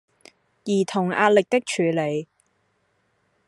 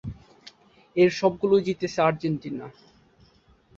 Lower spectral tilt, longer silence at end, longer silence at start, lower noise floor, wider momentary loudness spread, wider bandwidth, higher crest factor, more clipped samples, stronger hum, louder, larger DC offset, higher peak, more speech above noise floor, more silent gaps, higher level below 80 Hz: second, -5 dB/octave vs -6.5 dB/octave; first, 1.25 s vs 1.1 s; first, 0.65 s vs 0.05 s; first, -69 dBFS vs -59 dBFS; second, 10 LU vs 19 LU; first, 12 kHz vs 7.6 kHz; about the same, 20 dB vs 20 dB; neither; neither; about the same, -22 LUFS vs -24 LUFS; neither; about the same, -4 dBFS vs -6 dBFS; first, 48 dB vs 36 dB; neither; second, -74 dBFS vs -56 dBFS